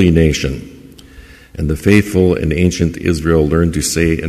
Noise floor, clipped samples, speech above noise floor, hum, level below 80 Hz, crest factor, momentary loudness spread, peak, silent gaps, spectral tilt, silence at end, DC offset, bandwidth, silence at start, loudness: -39 dBFS; under 0.1%; 26 dB; none; -26 dBFS; 14 dB; 10 LU; 0 dBFS; none; -6 dB/octave; 0 s; under 0.1%; 15 kHz; 0 s; -14 LUFS